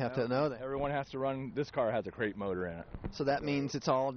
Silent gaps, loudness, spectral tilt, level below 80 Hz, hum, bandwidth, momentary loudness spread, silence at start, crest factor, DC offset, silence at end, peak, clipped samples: none; -35 LUFS; -5 dB/octave; -56 dBFS; none; 6.6 kHz; 6 LU; 0 s; 18 dB; under 0.1%; 0 s; -16 dBFS; under 0.1%